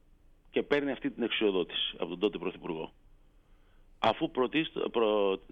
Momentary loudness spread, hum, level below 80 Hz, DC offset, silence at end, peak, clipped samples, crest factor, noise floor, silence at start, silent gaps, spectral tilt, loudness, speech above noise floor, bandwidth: 9 LU; none; -60 dBFS; under 0.1%; 0.15 s; -14 dBFS; under 0.1%; 18 dB; -60 dBFS; 0.55 s; none; -6.5 dB/octave; -31 LUFS; 29 dB; 7.2 kHz